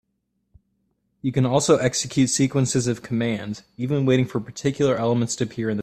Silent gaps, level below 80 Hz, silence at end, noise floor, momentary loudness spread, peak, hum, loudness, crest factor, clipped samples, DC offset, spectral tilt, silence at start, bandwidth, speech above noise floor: none; -56 dBFS; 0 s; -74 dBFS; 8 LU; -4 dBFS; none; -22 LUFS; 18 dB; under 0.1%; under 0.1%; -5 dB/octave; 1.25 s; 14 kHz; 52 dB